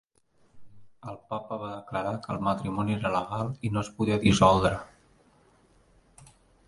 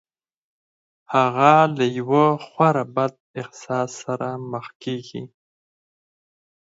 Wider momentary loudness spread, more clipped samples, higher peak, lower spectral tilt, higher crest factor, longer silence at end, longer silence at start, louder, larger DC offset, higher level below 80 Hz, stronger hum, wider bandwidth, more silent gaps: about the same, 16 LU vs 18 LU; neither; second, -6 dBFS vs 0 dBFS; about the same, -6 dB/octave vs -6.5 dB/octave; about the same, 22 dB vs 22 dB; second, 0.45 s vs 1.35 s; second, 0.55 s vs 1.1 s; second, -27 LUFS vs -20 LUFS; neither; first, -50 dBFS vs -72 dBFS; neither; first, 11.5 kHz vs 8 kHz; second, none vs 3.20-3.34 s, 4.75-4.80 s